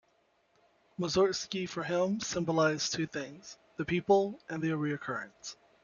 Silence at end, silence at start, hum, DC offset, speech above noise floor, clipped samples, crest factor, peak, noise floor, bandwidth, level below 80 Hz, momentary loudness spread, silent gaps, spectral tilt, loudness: 0.3 s; 1 s; none; under 0.1%; 40 dB; under 0.1%; 20 dB; -12 dBFS; -71 dBFS; 7.4 kHz; -66 dBFS; 17 LU; none; -4.5 dB/octave; -32 LUFS